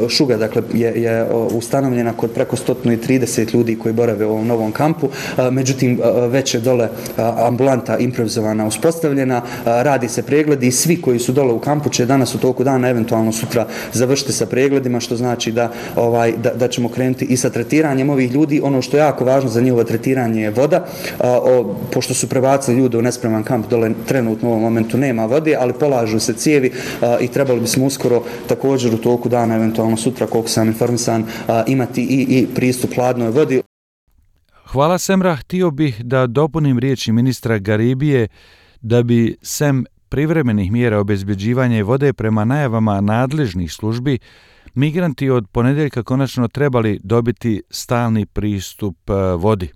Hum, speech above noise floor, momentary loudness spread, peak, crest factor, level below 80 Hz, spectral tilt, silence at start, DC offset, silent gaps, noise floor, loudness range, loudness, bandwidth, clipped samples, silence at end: none; 38 dB; 5 LU; -2 dBFS; 14 dB; -46 dBFS; -6 dB/octave; 0 s; under 0.1%; 33.66-34.07 s; -54 dBFS; 2 LU; -16 LUFS; 15.5 kHz; under 0.1%; 0.05 s